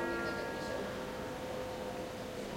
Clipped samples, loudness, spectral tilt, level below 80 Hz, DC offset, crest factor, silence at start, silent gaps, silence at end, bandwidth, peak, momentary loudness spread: under 0.1%; -40 LUFS; -4.5 dB/octave; -58 dBFS; under 0.1%; 14 dB; 0 s; none; 0 s; 16 kHz; -26 dBFS; 5 LU